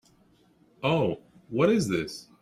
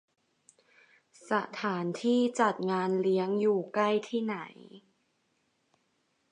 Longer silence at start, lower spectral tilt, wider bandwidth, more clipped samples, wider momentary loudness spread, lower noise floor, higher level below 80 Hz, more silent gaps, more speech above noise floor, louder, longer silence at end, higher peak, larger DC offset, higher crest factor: second, 0.8 s vs 1.25 s; about the same, -6 dB/octave vs -6 dB/octave; first, 14.5 kHz vs 10.5 kHz; neither; first, 13 LU vs 6 LU; second, -62 dBFS vs -75 dBFS; first, -60 dBFS vs -84 dBFS; neither; second, 36 dB vs 46 dB; first, -27 LUFS vs -30 LUFS; second, 0.2 s vs 1.55 s; about the same, -10 dBFS vs -12 dBFS; neither; about the same, 20 dB vs 20 dB